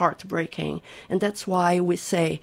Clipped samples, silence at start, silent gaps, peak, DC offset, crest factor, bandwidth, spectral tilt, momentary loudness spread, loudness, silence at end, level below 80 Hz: under 0.1%; 0 s; none; -6 dBFS; under 0.1%; 20 dB; 16 kHz; -5.5 dB/octave; 9 LU; -25 LUFS; 0.05 s; -58 dBFS